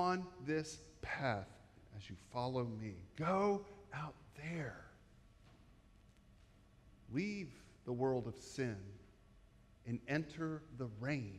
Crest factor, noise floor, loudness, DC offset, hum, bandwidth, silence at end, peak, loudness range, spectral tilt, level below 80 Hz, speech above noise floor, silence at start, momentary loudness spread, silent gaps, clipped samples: 18 dB; -66 dBFS; -43 LUFS; under 0.1%; none; 12.5 kHz; 0 s; -24 dBFS; 8 LU; -6.5 dB/octave; -68 dBFS; 24 dB; 0 s; 16 LU; none; under 0.1%